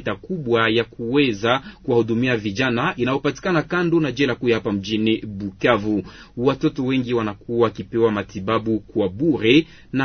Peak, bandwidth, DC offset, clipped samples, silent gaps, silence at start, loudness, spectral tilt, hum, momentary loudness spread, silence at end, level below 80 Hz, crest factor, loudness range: -2 dBFS; 6.6 kHz; under 0.1%; under 0.1%; none; 0 s; -21 LUFS; -6.5 dB/octave; none; 6 LU; 0 s; -50 dBFS; 18 dB; 2 LU